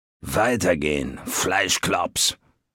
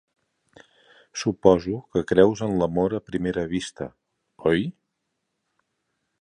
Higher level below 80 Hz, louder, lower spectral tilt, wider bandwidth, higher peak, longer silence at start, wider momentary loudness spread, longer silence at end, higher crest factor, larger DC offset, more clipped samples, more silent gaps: about the same, -46 dBFS vs -50 dBFS; about the same, -22 LUFS vs -23 LUFS; second, -2.5 dB/octave vs -6 dB/octave; first, 17 kHz vs 10 kHz; about the same, -4 dBFS vs -2 dBFS; second, 0.25 s vs 1.15 s; second, 7 LU vs 15 LU; second, 0.4 s vs 1.5 s; second, 18 dB vs 24 dB; neither; neither; neither